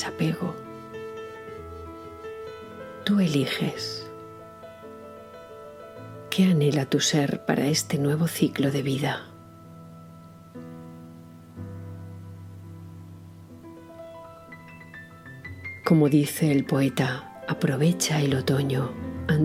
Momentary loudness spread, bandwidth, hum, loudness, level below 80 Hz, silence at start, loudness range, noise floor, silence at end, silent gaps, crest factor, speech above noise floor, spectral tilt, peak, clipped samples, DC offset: 23 LU; 16.5 kHz; none; -25 LUFS; -60 dBFS; 0 s; 19 LU; -47 dBFS; 0 s; none; 20 dB; 23 dB; -5.5 dB/octave; -6 dBFS; under 0.1%; under 0.1%